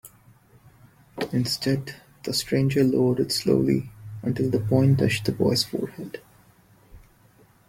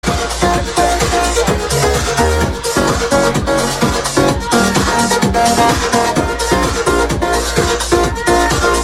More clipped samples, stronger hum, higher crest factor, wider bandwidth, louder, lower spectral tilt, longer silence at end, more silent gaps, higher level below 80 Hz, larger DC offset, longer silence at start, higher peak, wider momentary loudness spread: neither; neither; about the same, 18 dB vs 14 dB; about the same, 16.5 kHz vs 16.5 kHz; second, -24 LUFS vs -13 LUFS; first, -6 dB/octave vs -4 dB/octave; first, 0.7 s vs 0 s; neither; second, -54 dBFS vs -24 dBFS; neither; about the same, 0.05 s vs 0.05 s; second, -6 dBFS vs 0 dBFS; first, 17 LU vs 3 LU